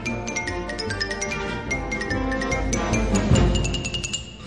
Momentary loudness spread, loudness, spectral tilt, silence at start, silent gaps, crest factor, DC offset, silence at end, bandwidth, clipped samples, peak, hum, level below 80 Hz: 8 LU; -24 LUFS; -4.5 dB/octave; 0 s; none; 18 dB; 0.1%; 0 s; 11 kHz; under 0.1%; -6 dBFS; none; -30 dBFS